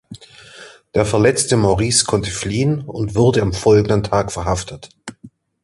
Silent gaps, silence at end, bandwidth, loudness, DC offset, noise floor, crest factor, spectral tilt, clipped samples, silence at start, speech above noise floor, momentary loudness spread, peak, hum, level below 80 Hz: none; 0.35 s; 11.5 kHz; -17 LUFS; under 0.1%; -45 dBFS; 16 dB; -5 dB/octave; under 0.1%; 0.1 s; 29 dB; 19 LU; 0 dBFS; none; -38 dBFS